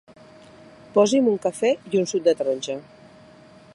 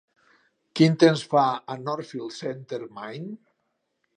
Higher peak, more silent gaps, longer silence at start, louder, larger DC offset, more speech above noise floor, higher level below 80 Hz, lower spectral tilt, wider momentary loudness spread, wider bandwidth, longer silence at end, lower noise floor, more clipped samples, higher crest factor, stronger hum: about the same, -6 dBFS vs -4 dBFS; neither; first, 0.95 s vs 0.75 s; about the same, -22 LUFS vs -24 LUFS; neither; second, 28 dB vs 52 dB; first, -68 dBFS vs -74 dBFS; second, -4.5 dB/octave vs -6.5 dB/octave; second, 9 LU vs 19 LU; first, 11.5 kHz vs 10 kHz; first, 0.95 s vs 0.8 s; second, -49 dBFS vs -76 dBFS; neither; about the same, 18 dB vs 22 dB; neither